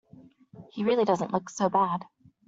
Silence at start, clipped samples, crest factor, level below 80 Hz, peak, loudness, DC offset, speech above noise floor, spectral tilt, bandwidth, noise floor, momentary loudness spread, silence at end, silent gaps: 0.15 s; under 0.1%; 18 dB; -70 dBFS; -10 dBFS; -27 LUFS; under 0.1%; 28 dB; -6 dB/octave; 8 kHz; -54 dBFS; 8 LU; 0.45 s; none